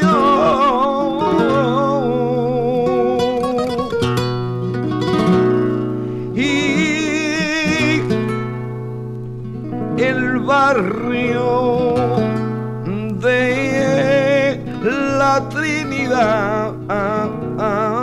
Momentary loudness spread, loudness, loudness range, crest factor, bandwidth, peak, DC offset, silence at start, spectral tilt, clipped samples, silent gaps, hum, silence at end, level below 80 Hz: 9 LU; -17 LUFS; 2 LU; 12 dB; 13 kHz; -4 dBFS; under 0.1%; 0 s; -6 dB/octave; under 0.1%; none; none; 0 s; -44 dBFS